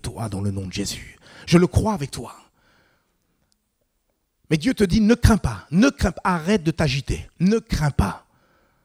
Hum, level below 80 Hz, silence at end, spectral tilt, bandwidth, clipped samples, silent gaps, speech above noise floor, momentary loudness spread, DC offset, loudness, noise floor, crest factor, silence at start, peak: none; -34 dBFS; 0.65 s; -6 dB/octave; 15.5 kHz; under 0.1%; none; 51 dB; 14 LU; under 0.1%; -21 LUFS; -71 dBFS; 22 dB; 0.05 s; 0 dBFS